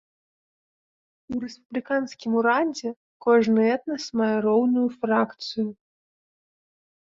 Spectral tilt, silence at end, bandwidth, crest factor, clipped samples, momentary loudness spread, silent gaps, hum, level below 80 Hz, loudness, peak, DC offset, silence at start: -5.5 dB/octave; 1.3 s; 7.6 kHz; 16 dB; under 0.1%; 12 LU; 1.65-1.70 s, 2.96-3.20 s; none; -68 dBFS; -24 LUFS; -8 dBFS; under 0.1%; 1.3 s